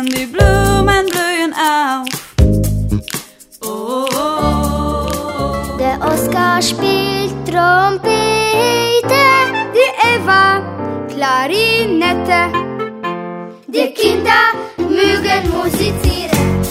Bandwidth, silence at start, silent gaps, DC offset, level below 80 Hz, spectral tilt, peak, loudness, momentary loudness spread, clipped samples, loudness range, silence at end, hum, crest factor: 16.5 kHz; 0 s; none; under 0.1%; -26 dBFS; -4.5 dB/octave; 0 dBFS; -14 LUFS; 11 LU; under 0.1%; 5 LU; 0 s; none; 14 dB